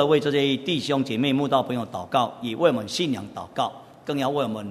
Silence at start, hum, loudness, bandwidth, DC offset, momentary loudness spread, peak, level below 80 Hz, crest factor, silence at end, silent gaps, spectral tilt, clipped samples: 0 s; none; -24 LUFS; 13.5 kHz; under 0.1%; 8 LU; -4 dBFS; -64 dBFS; 18 dB; 0 s; none; -5.5 dB/octave; under 0.1%